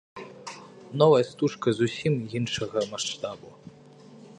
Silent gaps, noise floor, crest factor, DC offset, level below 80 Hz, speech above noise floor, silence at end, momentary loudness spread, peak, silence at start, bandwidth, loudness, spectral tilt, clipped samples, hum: none; -50 dBFS; 22 dB; under 0.1%; -64 dBFS; 25 dB; 0.05 s; 21 LU; -6 dBFS; 0.15 s; 10.5 kHz; -26 LUFS; -5.5 dB/octave; under 0.1%; none